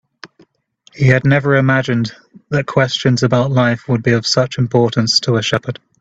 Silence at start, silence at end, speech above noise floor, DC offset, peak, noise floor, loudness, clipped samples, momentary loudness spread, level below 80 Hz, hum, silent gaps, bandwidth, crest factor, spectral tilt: 0.25 s; 0.3 s; 39 dB; under 0.1%; 0 dBFS; -53 dBFS; -15 LUFS; under 0.1%; 7 LU; -50 dBFS; none; none; 8 kHz; 16 dB; -5.5 dB/octave